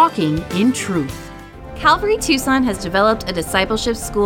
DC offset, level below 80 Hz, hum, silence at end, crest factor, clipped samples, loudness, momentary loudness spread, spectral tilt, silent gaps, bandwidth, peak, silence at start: under 0.1%; -36 dBFS; none; 0 s; 16 dB; under 0.1%; -17 LUFS; 13 LU; -4.5 dB/octave; none; 17.5 kHz; 0 dBFS; 0 s